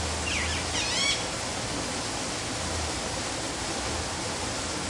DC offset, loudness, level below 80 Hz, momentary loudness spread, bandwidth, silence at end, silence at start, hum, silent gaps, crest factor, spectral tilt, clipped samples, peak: under 0.1%; -29 LUFS; -44 dBFS; 6 LU; 11.5 kHz; 0 s; 0 s; none; none; 16 dB; -2.5 dB/octave; under 0.1%; -14 dBFS